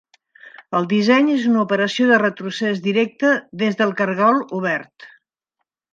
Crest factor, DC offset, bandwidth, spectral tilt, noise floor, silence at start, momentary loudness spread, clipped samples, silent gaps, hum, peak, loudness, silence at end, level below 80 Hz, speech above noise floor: 18 dB; under 0.1%; 7.6 kHz; -6 dB/octave; -78 dBFS; 0.45 s; 8 LU; under 0.1%; none; none; -2 dBFS; -18 LUFS; 0.85 s; -72 dBFS; 60 dB